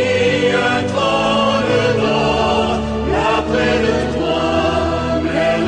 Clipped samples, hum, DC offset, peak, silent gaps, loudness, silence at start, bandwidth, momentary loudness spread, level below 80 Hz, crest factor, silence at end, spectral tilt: under 0.1%; none; under 0.1%; -4 dBFS; none; -16 LUFS; 0 s; 10 kHz; 3 LU; -32 dBFS; 12 dB; 0 s; -5.5 dB/octave